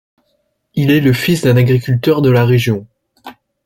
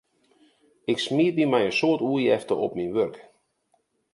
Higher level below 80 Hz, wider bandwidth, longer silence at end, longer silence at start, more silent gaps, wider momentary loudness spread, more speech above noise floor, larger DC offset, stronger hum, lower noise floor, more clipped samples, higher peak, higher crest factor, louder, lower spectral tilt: first, -46 dBFS vs -66 dBFS; first, 16.5 kHz vs 11.5 kHz; second, 0.35 s vs 0.9 s; second, 0.75 s vs 0.9 s; neither; about the same, 7 LU vs 6 LU; first, 53 dB vs 47 dB; neither; neither; second, -64 dBFS vs -70 dBFS; neither; first, -2 dBFS vs -8 dBFS; second, 12 dB vs 18 dB; first, -13 LUFS vs -24 LUFS; first, -7 dB/octave vs -5.5 dB/octave